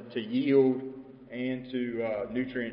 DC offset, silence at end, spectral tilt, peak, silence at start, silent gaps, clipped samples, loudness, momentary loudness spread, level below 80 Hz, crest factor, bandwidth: under 0.1%; 0 s; -10.5 dB/octave; -12 dBFS; 0 s; none; under 0.1%; -29 LUFS; 17 LU; -66 dBFS; 18 dB; 5.2 kHz